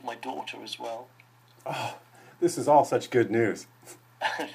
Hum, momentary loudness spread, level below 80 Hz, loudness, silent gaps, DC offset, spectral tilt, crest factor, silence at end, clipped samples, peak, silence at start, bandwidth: none; 19 LU; -76 dBFS; -28 LUFS; none; under 0.1%; -5 dB/octave; 22 dB; 0 s; under 0.1%; -8 dBFS; 0.05 s; 15.5 kHz